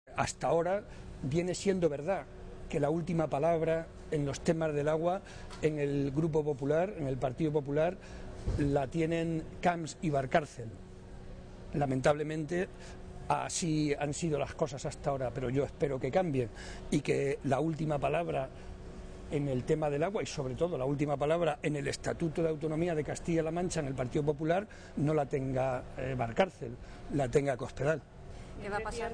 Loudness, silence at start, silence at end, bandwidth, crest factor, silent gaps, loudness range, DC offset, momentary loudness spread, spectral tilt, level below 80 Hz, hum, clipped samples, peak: -33 LUFS; 0.05 s; 0 s; 10 kHz; 16 dB; none; 2 LU; under 0.1%; 14 LU; -6 dB/octave; -50 dBFS; none; under 0.1%; -16 dBFS